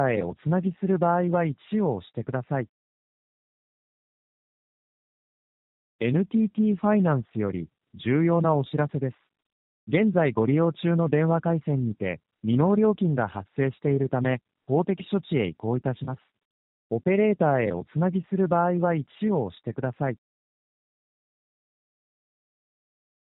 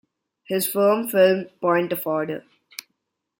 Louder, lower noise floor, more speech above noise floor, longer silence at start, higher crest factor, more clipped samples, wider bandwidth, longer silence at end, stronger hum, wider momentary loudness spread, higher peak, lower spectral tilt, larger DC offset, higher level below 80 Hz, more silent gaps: second, -25 LUFS vs -21 LUFS; first, under -90 dBFS vs -77 dBFS; first, over 66 dB vs 56 dB; second, 0 s vs 0.5 s; about the same, 18 dB vs 18 dB; neither; second, 4 kHz vs 17 kHz; first, 3.1 s vs 1 s; neither; second, 10 LU vs 21 LU; about the same, -8 dBFS vs -6 dBFS; first, -8 dB/octave vs -4.5 dB/octave; neither; first, -64 dBFS vs -70 dBFS; first, 2.69-5.99 s, 9.52-9.87 s, 16.45-16.90 s vs none